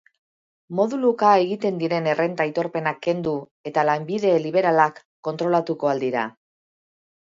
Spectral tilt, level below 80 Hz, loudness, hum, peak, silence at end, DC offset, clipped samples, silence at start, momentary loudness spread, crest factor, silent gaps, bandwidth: -6.5 dB/octave; -70 dBFS; -22 LUFS; none; -4 dBFS; 1.1 s; under 0.1%; under 0.1%; 0.7 s; 9 LU; 20 dB; 3.51-3.64 s, 5.05-5.23 s; 7.6 kHz